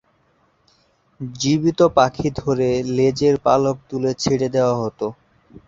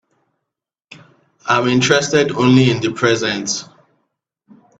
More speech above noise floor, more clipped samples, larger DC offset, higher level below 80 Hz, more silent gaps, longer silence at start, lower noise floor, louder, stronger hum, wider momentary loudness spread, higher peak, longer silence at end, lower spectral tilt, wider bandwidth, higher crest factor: second, 43 dB vs 66 dB; neither; neither; first, -50 dBFS vs -56 dBFS; neither; second, 1.2 s vs 1.45 s; second, -61 dBFS vs -81 dBFS; second, -19 LUFS vs -15 LUFS; neither; about the same, 10 LU vs 9 LU; about the same, -2 dBFS vs 0 dBFS; second, 0.55 s vs 1.15 s; first, -6 dB/octave vs -4.5 dB/octave; about the same, 8 kHz vs 8.4 kHz; about the same, 18 dB vs 18 dB